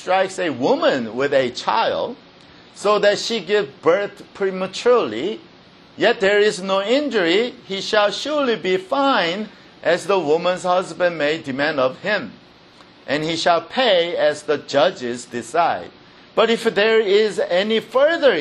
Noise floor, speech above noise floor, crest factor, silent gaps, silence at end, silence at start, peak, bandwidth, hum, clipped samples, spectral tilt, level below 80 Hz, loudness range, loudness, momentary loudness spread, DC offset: -47 dBFS; 28 dB; 18 dB; none; 0 s; 0 s; -2 dBFS; 12 kHz; none; under 0.1%; -4 dB/octave; -64 dBFS; 2 LU; -19 LUFS; 9 LU; under 0.1%